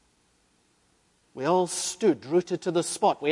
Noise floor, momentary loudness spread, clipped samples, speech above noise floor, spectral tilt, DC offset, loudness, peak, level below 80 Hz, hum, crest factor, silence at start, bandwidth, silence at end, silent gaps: -67 dBFS; 4 LU; under 0.1%; 41 dB; -4 dB/octave; under 0.1%; -26 LUFS; -8 dBFS; -72 dBFS; none; 18 dB; 1.35 s; 11.5 kHz; 0 s; none